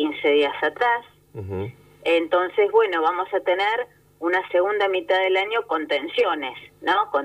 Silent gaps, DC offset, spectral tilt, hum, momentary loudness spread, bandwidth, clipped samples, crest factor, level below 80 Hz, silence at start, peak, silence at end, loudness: none; under 0.1%; -5.5 dB/octave; 50 Hz at -60 dBFS; 12 LU; 14.5 kHz; under 0.1%; 16 dB; -66 dBFS; 0 s; -6 dBFS; 0 s; -22 LUFS